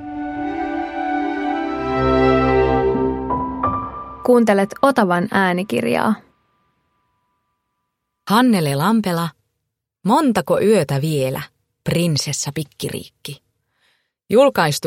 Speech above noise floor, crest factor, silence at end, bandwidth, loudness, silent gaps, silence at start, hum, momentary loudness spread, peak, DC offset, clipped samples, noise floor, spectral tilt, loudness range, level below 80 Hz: 61 dB; 18 dB; 0 s; 16.5 kHz; -18 LUFS; none; 0 s; none; 13 LU; 0 dBFS; under 0.1%; under 0.1%; -77 dBFS; -5.5 dB/octave; 4 LU; -40 dBFS